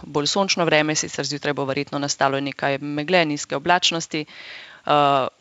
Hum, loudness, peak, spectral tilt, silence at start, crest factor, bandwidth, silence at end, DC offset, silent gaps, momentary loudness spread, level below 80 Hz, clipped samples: none; -21 LUFS; -2 dBFS; -3.5 dB/octave; 0 s; 20 dB; 8 kHz; 0.1 s; under 0.1%; none; 11 LU; -64 dBFS; under 0.1%